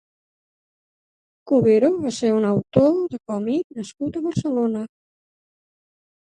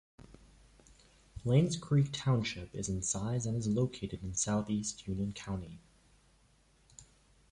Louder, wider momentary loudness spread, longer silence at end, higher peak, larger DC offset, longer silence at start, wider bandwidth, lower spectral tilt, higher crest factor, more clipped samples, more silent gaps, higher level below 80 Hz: first, -21 LUFS vs -34 LUFS; about the same, 12 LU vs 12 LU; first, 1.45 s vs 0.5 s; first, -2 dBFS vs -16 dBFS; neither; first, 1.45 s vs 0.2 s; about the same, 11 kHz vs 11.5 kHz; first, -7 dB/octave vs -5.5 dB/octave; about the same, 20 dB vs 20 dB; neither; first, 3.64-3.70 s vs none; about the same, -56 dBFS vs -56 dBFS